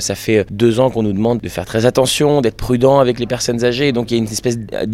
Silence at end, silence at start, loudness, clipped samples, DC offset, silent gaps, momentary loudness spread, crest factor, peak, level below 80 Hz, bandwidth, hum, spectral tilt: 0 s; 0 s; -15 LUFS; under 0.1%; under 0.1%; none; 7 LU; 14 dB; 0 dBFS; -38 dBFS; 16.5 kHz; none; -5 dB/octave